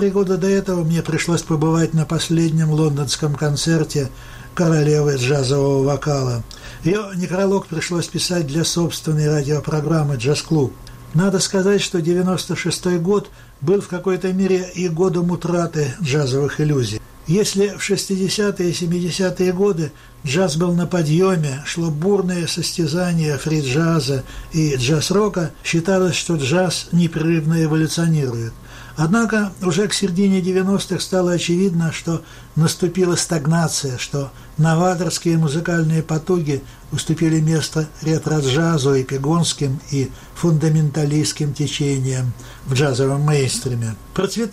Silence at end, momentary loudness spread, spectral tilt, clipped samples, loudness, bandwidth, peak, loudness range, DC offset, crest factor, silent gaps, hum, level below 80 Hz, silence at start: 0 s; 7 LU; -5.5 dB/octave; under 0.1%; -19 LUFS; 15 kHz; -6 dBFS; 1 LU; under 0.1%; 12 dB; none; none; -44 dBFS; 0 s